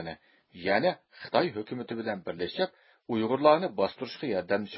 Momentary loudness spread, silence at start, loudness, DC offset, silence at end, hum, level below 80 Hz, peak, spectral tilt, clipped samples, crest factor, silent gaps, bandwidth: 13 LU; 0 s; -29 LUFS; under 0.1%; 0 s; none; -66 dBFS; -8 dBFS; -9.5 dB/octave; under 0.1%; 22 dB; none; 5.8 kHz